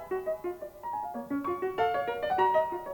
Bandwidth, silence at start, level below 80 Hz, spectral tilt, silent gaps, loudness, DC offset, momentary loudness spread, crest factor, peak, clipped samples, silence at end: over 20 kHz; 0 s; -62 dBFS; -6 dB/octave; none; -31 LUFS; under 0.1%; 11 LU; 16 dB; -16 dBFS; under 0.1%; 0 s